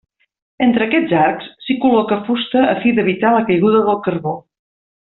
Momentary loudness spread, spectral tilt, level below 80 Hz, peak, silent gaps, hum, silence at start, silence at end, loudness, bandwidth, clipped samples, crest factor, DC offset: 9 LU; -4.5 dB/octave; -56 dBFS; -2 dBFS; none; none; 0.6 s; 0.75 s; -15 LUFS; 4.2 kHz; under 0.1%; 14 dB; under 0.1%